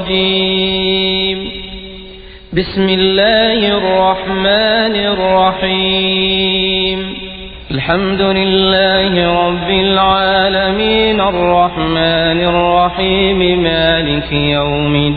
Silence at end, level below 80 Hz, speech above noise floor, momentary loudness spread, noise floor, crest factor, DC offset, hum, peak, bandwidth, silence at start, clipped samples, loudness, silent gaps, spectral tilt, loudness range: 0 s; -32 dBFS; 21 dB; 9 LU; -33 dBFS; 12 dB; under 0.1%; none; 0 dBFS; 5 kHz; 0 s; under 0.1%; -12 LUFS; none; -9.5 dB/octave; 2 LU